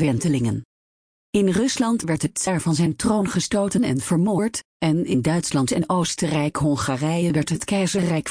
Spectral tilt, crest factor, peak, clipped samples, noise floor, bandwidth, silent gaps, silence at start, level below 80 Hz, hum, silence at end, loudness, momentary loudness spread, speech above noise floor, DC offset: -5.5 dB/octave; 12 dB; -8 dBFS; under 0.1%; under -90 dBFS; 10.5 kHz; 0.65-1.33 s, 4.65-4.80 s; 0 s; -50 dBFS; none; 0 s; -22 LUFS; 3 LU; over 69 dB; under 0.1%